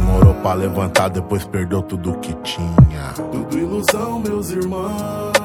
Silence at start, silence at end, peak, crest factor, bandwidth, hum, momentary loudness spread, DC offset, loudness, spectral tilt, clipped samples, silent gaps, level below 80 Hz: 0 s; 0 s; 0 dBFS; 16 dB; 18 kHz; none; 11 LU; under 0.1%; -18 LUFS; -6 dB/octave; under 0.1%; none; -28 dBFS